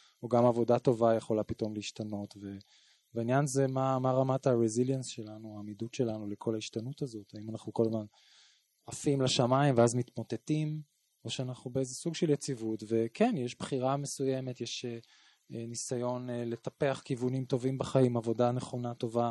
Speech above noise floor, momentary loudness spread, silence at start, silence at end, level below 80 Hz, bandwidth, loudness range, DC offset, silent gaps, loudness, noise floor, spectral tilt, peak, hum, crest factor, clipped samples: 34 dB; 15 LU; 0.2 s; 0 s; -68 dBFS; 12 kHz; 5 LU; under 0.1%; none; -32 LUFS; -65 dBFS; -6 dB/octave; -14 dBFS; none; 20 dB; under 0.1%